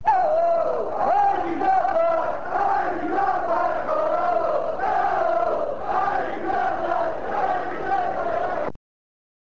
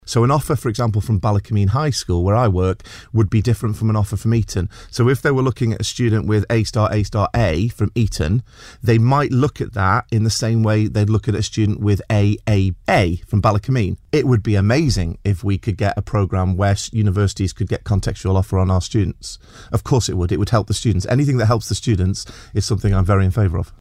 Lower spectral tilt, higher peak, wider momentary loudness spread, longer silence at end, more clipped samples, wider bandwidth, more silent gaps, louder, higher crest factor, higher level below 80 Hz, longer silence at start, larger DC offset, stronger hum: about the same, -6.5 dB/octave vs -6.5 dB/octave; second, -10 dBFS vs -2 dBFS; about the same, 5 LU vs 5 LU; first, 0.9 s vs 0.15 s; neither; second, 7.4 kHz vs 14 kHz; neither; second, -23 LUFS vs -18 LUFS; about the same, 12 dB vs 16 dB; second, -52 dBFS vs -34 dBFS; about the same, 0.05 s vs 0.05 s; first, 2% vs under 0.1%; neither